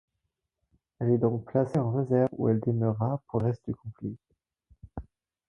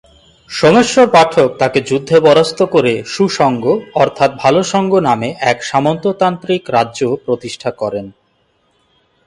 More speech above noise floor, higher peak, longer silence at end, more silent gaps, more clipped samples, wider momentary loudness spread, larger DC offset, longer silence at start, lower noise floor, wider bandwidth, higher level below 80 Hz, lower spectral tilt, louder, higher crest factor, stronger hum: first, 55 dB vs 46 dB; second, -12 dBFS vs 0 dBFS; second, 0.45 s vs 1.15 s; neither; neither; first, 19 LU vs 10 LU; neither; first, 1 s vs 0.5 s; first, -83 dBFS vs -59 dBFS; second, 6 kHz vs 11.5 kHz; about the same, -56 dBFS vs -52 dBFS; first, -11 dB/octave vs -5 dB/octave; second, -28 LUFS vs -13 LUFS; about the same, 18 dB vs 14 dB; neither